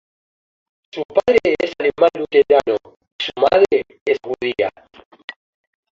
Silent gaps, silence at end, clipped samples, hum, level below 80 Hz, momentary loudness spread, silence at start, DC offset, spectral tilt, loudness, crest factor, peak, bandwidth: 1.05-1.09 s, 3.12-3.19 s, 4.01-4.06 s; 1.25 s; under 0.1%; none; -54 dBFS; 19 LU; 0.95 s; under 0.1%; -5 dB/octave; -17 LUFS; 18 dB; -2 dBFS; 7.6 kHz